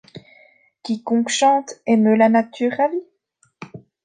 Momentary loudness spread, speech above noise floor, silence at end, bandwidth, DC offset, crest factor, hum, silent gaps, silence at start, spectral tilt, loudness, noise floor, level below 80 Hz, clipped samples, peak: 23 LU; 46 dB; 0.25 s; 9.6 kHz; under 0.1%; 18 dB; none; none; 0.15 s; -4.5 dB/octave; -18 LUFS; -64 dBFS; -70 dBFS; under 0.1%; -2 dBFS